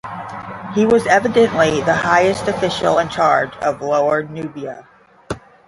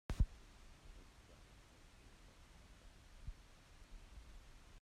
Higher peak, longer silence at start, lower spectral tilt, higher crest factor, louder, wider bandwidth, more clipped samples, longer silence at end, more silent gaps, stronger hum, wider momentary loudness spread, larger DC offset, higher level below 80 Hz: first, 0 dBFS vs -24 dBFS; about the same, 0.05 s vs 0.1 s; about the same, -5 dB/octave vs -6 dB/octave; second, 16 dB vs 26 dB; first, -16 LUFS vs -54 LUFS; second, 11.5 kHz vs 13 kHz; neither; first, 0.3 s vs 0.05 s; neither; neither; about the same, 16 LU vs 18 LU; neither; about the same, -48 dBFS vs -50 dBFS